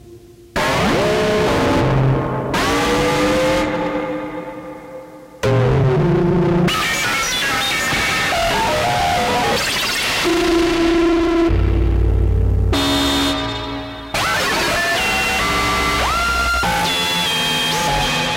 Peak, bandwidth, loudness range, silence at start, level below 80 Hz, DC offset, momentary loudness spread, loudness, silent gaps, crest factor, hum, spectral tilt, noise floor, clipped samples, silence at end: -4 dBFS; 16 kHz; 3 LU; 0.05 s; -28 dBFS; under 0.1%; 7 LU; -16 LUFS; none; 12 dB; none; -4.5 dB/octave; -41 dBFS; under 0.1%; 0 s